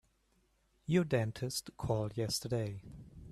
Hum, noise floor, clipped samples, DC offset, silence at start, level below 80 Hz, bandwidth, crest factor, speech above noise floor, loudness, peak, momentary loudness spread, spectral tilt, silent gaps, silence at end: none; -74 dBFS; under 0.1%; under 0.1%; 0.9 s; -60 dBFS; 14 kHz; 18 dB; 39 dB; -36 LUFS; -18 dBFS; 18 LU; -5.5 dB/octave; none; 0 s